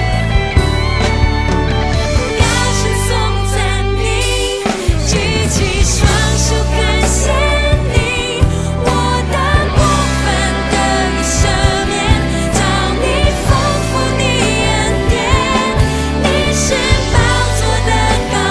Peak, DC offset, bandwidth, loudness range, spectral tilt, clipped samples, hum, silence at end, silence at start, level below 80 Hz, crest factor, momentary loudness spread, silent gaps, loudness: 0 dBFS; under 0.1%; 11 kHz; 1 LU; -4.5 dB/octave; under 0.1%; none; 0 s; 0 s; -18 dBFS; 12 dB; 3 LU; none; -13 LUFS